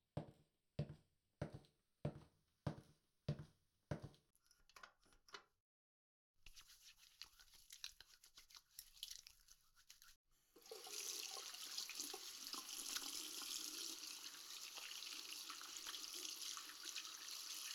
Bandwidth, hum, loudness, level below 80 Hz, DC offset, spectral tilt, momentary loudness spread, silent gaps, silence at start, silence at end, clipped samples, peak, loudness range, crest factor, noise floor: over 20 kHz; none; -51 LUFS; -76 dBFS; under 0.1%; -2 dB/octave; 18 LU; 5.60-6.34 s, 10.16-10.25 s; 0.15 s; 0 s; under 0.1%; -28 dBFS; 13 LU; 28 dB; -72 dBFS